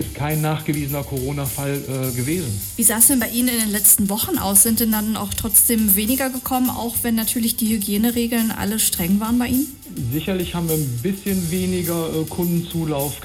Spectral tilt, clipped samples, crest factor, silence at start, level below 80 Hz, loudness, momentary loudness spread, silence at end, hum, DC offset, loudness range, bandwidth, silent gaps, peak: -4 dB/octave; under 0.1%; 18 dB; 0 s; -40 dBFS; -18 LUFS; 11 LU; 0 s; none; under 0.1%; 7 LU; over 20 kHz; none; -2 dBFS